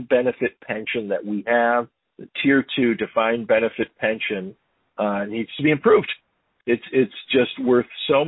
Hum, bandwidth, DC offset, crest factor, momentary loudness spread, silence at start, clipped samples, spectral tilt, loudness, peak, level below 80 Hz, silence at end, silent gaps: none; 4.1 kHz; under 0.1%; 16 dB; 11 LU; 0 s; under 0.1%; -10.5 dB/octave; -21 LUFS; -4 dBFS; -60 dBFS; 0 s; none